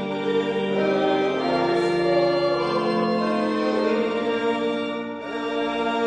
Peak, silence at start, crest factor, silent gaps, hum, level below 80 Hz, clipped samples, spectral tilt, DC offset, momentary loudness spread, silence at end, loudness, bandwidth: -10 dBFS; 0 s; 12 dB; none; none; -60 dBFS; under 0.1%; -6 dB/octave; under 0.1%; 6 LU; 0 s; -23 LUFS; 9.8 kHz